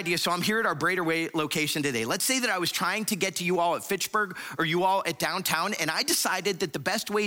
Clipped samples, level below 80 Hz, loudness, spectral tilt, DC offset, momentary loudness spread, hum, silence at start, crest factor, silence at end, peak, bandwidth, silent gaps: under 0.1%; -70 dBFS; -26 LUFS; -2.5 dB/octave; under 0.1%; 4 LU; none; 0 s; 18 dB; 0 s; -10 dBFS; 17 kHz; none